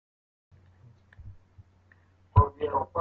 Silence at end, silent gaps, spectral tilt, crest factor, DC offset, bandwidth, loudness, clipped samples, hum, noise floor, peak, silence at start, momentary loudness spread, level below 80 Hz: 0 s; none; -11 dB/octave; 24 dB; under 0.1%; 3.4 kHz; -26 LUFS; under 0.1%; none; -61 dBFS; -8 dBFS; 1.2 s; 27 LU; -44 dBFS